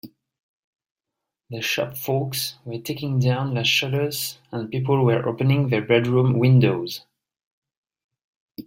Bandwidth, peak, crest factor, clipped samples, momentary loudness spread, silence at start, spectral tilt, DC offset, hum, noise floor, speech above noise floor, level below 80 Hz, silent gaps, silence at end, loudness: 16.5 kHz; -4 dBFS; 18 dB; under 0.1%; 12 LU; 0.05 s; -5.5 dB/octave; under 0.1%; none; -85 dBFS; 64 dB; -60 dBFS; 0.43-0.73 s, 0.91-0.96 s, 7.46-7.62 s, 7.77-7.83 s, 8.04-8.09 s, 8.24-8.48 s; 0.05 s; -21 LUFS